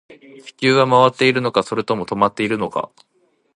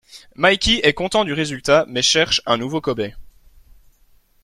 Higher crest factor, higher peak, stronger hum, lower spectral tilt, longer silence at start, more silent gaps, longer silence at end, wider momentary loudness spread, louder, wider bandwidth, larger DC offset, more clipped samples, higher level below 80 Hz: about the same, 18 dB vs 18 dB; about the same, 0 dBFS vs -2 dBFS; neither; first, -5.5 dB/octave vs -3 dB/octave; about the same, 0.1 s vs 0.15 s; neither; second, 0.7 s vs 1.15 s; about the same, 10 LU vs 8 LU; about the same, -17 LUFS vs -17 LUFS; second, 11 kHz vs 14 kHz; neither; neither; second, -58 dBFS vs -40 dBFS